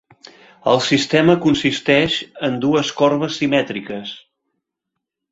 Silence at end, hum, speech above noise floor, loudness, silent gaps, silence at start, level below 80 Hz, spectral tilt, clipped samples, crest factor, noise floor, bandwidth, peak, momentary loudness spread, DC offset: 1.15 s; none; 63 dB; -17 LUFS; none; 0.65 s; -54 dBFS; -5 dB/octave; under 0.1%; 18 dB; -80 dBFS; 8 kHz; -2 dBFS; 13 LU; under 0.1%